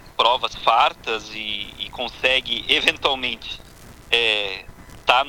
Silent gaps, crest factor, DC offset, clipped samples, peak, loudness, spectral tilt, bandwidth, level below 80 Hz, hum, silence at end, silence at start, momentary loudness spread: none; 22 dB; under 0.1%; under 0.1%; 0 dBFS; -20 LUFS; -2 dB/octave; 19 kHz; -48 dBFS; none; 0 s; 0 s; 12 LU